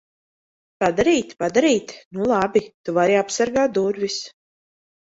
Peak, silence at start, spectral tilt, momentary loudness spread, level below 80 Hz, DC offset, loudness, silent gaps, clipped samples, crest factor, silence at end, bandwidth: -4 dBFS; 0.8 s; -4.5 dB/octave; 8 LU; -56 dBFS; under 0.1%; -20 LUFS; 2.05-2.11 s, 2.74-2.84 s; under 0.1%; 16 dB; 0.75 s; 8 kHz